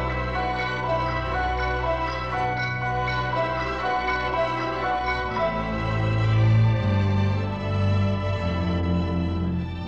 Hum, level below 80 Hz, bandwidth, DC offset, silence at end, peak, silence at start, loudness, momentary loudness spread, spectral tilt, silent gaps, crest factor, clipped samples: none; -36 dBFS; 7.2 kHz; 0.3%; 0 s; -10 dBFS; 0 s; -24 LUFS; 5 LU; -7.5 dB/octave; none; 12 dB; under 0.1%